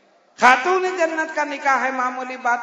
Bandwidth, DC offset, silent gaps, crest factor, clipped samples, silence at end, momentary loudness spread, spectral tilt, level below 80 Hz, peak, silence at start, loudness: 12 kHz; under 0.1%; none; 20 dB; under 0.1%; 0 s; 9 LU; -2 dB/octave; -68 dBFS; 0 dBFS; 0.4 s; -19 LUFS